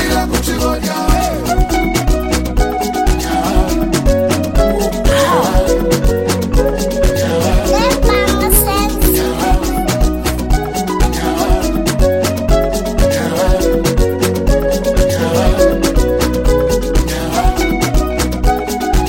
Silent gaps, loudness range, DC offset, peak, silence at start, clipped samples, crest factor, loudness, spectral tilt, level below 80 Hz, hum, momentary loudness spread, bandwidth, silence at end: none; 2 LU; under 0.1%; 0 dBFS; 0 s; under 0.1%; 12 dB; -14 LUFS; -5 dB/octave; -16 dBFS; none; 4 LU; 16.5 kHz; 0 s